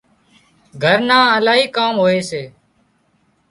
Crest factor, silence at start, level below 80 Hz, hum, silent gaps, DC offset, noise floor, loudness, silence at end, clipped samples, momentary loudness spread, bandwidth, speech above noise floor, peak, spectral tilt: 18 dB; 0.75 s; -60 dBFS; none; none; under 0.1%; -60 dBFS; -14 LUFS; 1 s; under 0.1%; 15 LU; 11.5 kHz; 46 dB; 0 dBFS; -4.5 dB/octave